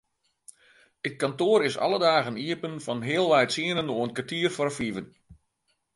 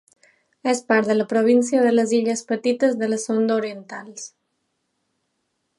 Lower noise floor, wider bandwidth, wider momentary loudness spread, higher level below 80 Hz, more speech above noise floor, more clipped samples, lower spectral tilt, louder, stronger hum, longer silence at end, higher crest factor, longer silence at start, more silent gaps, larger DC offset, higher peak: about the same, -75 dBFS vs -74 dBFS; about the same, 11.5 kHz vs 11.5 kHz; second, 10 LU vs 18 LU; first, -66 dBFS vs -76 dBFS; second, 49 dB vs 54 dB; neither; about the same, -4.5 dB/octave vs -4.5 dB/octave; second, -26 LUFS vs -20 LUFS; neither; second, 0.6 s vs 1.5 s; about the same, 20 dB vs 18 dB; first, 1.05 s vs 0.65 s; neither; neither; second, -8 dBFS vs -4 dBFS